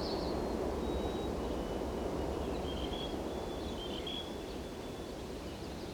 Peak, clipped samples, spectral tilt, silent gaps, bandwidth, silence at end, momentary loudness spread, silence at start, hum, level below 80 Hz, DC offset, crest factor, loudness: -24 dBFS; under 0.1%; -5.5 dB/octave; none; over 20 kHz; 0 s; 7 LU; 0 s; none; -46 dBFS; under 0.1%; 14 dB; -39 LUFS